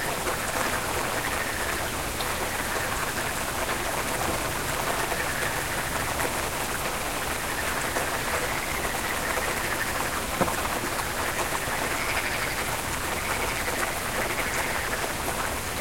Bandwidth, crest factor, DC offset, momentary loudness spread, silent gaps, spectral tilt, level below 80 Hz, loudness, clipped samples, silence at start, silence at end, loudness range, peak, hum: 16.5 kHz; 20 dB; under 0.1%; 2 LU; none; -2.5 dB/octave; -42 dBFS; -27 LUFS; under 0.1%; 0 s; 0 s; 1 LU; -8 dBFS; none